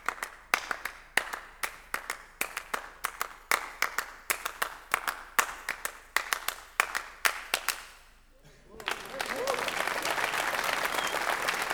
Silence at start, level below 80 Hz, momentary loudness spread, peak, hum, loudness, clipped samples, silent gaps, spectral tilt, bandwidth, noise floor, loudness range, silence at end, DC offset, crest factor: 0 s; -60 dBFS; 8 LU; -4 dBFS; none; -32 LUFS; under 0.1%; none; 0 dB/octave; over 20 kHz; -57 dBFS; 3 LU; 0 s; under 0.1%; 30 dB